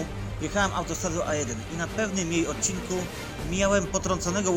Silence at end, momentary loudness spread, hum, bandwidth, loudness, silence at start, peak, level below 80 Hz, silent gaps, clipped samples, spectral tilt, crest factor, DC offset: 0 s; 8 LU; none; 17 kHz; -28 LUFS; 0 s; -8 dBFS; -40 dBFS; none; under 0.1%; -4 dB/octave; 18 dB; under 0.1%